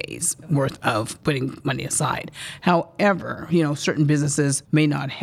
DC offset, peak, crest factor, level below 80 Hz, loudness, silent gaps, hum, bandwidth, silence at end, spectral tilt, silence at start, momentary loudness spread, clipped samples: under 0.1%; -4 dBFS; 18 dB; -56 dBFS; -22 LUFS; none; none; 15.5 kHz; 0 s; -5 dB/octave; 0 s; 6 LU; under 0.1%